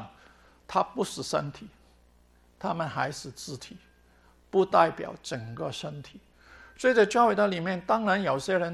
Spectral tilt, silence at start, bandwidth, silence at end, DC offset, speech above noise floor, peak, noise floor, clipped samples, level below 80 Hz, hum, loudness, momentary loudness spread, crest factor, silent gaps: -5 dB/octave; 0 s; 13 kHz; 0 s; under 0.1%; 33 dB; -6 dBFS; -61 dBFS; under 0.1%; -62 dBFS; none; -27 LUFS; 18 LU; 22 dB; none